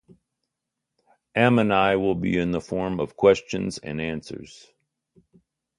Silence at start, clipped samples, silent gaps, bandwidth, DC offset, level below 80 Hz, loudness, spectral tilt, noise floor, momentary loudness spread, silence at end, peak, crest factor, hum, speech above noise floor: 1.35 s; under 0.1%; none; 11 kHz; under 0.1%; -52 dBFS; -23 LUFS; -6.5 dB/octave; -83 dBFS; 11 LU; 1.35 s; -2 dBFS; 22 dB; none; 60 dB